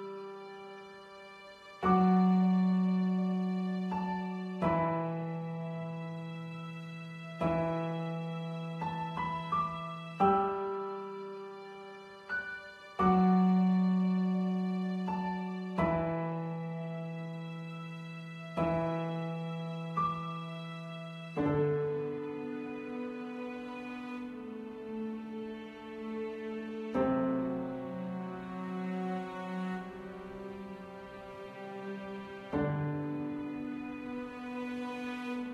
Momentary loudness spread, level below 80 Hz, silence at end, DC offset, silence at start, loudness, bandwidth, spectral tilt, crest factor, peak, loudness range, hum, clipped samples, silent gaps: 16 LU; -62 dBFS; 0 s; under 0.1%; 0 s; -35 LUFS; 6.8 kHz; -8.5 dB/octave; 20 dB; -14 dBFS; 10 LU; none; under 0.1%; none